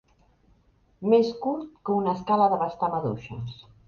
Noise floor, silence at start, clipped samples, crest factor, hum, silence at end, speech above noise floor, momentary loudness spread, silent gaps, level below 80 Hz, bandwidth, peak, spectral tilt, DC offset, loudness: -62 dBFS; 1 s; under 0.1%; 18 dB; none; 0.35 s; 37 dB; 14 LU; none; -60 dBFS; 7 kHz; -8 dBFS; -8 dB/octave; under 0.1%; -25 LUFS